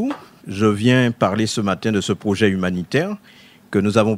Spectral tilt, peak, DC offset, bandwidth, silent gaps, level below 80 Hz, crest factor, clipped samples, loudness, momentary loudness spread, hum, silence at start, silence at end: -6 dB/octave; -2 dBFS; under 0.1%; 15 kHz; none; -56 dBFS; 18 dB; under 0.1%; -19 LUFS; 10 LU; none; 0 s; 0 s